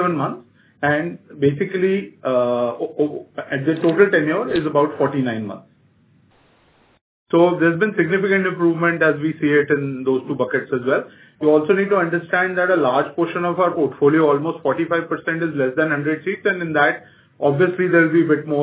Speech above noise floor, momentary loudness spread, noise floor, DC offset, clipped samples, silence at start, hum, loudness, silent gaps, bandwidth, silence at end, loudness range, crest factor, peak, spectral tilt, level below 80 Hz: 38 dB; 8 LU; -56 dBFS; under 0.1%; under 0.1%; 0 s; none; -19 LUFS; 7.01-7.26 s; 4 kHz; 0 s; 3 LU; 18 dB; -2 dBFS; -10.5 dB/octave; -62 dBFS